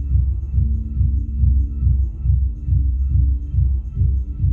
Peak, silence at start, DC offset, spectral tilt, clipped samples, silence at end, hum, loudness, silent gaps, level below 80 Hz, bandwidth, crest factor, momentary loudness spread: -6 dBFS; 0 s; under 0.1%; -12.5 dB/octave; under 0.1%; 0 s; none; -20 LUFS; none; -20 dBFS; 0.6 kHz; 12 dB; 2 LU